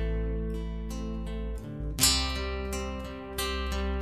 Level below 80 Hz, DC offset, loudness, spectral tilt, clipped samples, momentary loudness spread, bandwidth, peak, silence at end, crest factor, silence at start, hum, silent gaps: -34 dBFS; 0.1%; -31 LUFS; -3 dB/octave; under 0.1%; 14 LU; 14.5 kHz; -4 dBFS; 0 s; 26 dB; 0 s; none; none